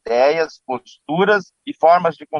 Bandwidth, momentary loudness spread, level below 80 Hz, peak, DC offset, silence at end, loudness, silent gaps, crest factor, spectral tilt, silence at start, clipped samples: 7 kHz; 14 LU; -64 dBFS; -2 dBFS; under 0.1%; 0 s; -17 LUFS; none; 16 dB; -6 dB/octave; 0.05 s; under 0.1%